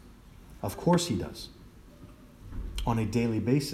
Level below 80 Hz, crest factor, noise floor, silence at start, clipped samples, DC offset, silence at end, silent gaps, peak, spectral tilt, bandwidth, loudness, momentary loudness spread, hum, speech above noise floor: -44 dBFS; 18 dB; -51 dBFS; 0.05 s; under 0.1%; under 0.1%; 0 s; none; -12 dBFS; -6 dB/octave; 16 kHz; -30 LUFS; 18 LU; none; 23 dB